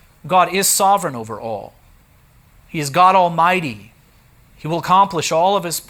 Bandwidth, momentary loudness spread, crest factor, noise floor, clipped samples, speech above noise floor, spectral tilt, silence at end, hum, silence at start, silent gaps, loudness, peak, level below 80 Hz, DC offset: over 20 kHz; 16 LU; 16 dB; -51 dBFS; under 0.1%; 34 dB; -3 dB/octave; 0.05 s; none; 0.25 s; none; -16 LUFS; -2 dBFS; -54 dBFS; under 0.1%